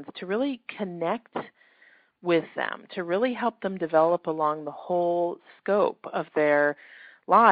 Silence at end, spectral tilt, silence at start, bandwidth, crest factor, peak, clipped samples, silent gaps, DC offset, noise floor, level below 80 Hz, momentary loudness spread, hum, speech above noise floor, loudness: 0 s; -4 dB/octave; 0 s; 4.9 kHz; 22 dB; -4 dBFS; under 0.1%; none; under 0.1%; -59 dBFS; -72 dBFS; 12 LU; none; 34 dB; -26 LUFS